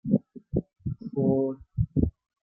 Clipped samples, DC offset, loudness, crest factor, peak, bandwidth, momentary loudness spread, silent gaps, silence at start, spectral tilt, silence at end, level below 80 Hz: under 0.1%; under 0.1%; -29 LUFS; 18 dB; -10 dBFS; 1.4 kHz; 8 LU; none; 0.05 s; -15.5 dB/octave; 0.35 s; -42 dBFS